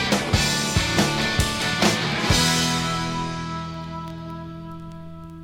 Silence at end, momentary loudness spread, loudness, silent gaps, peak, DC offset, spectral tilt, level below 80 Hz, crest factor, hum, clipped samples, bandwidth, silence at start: 0 s; 18 LU; -21 LUFS; none; -6 dBFS; under 0.1%; -3.5 dB/octave; -38 dBFS; 18 dB; none; under 0.1%; 17.5 kHz; 0 s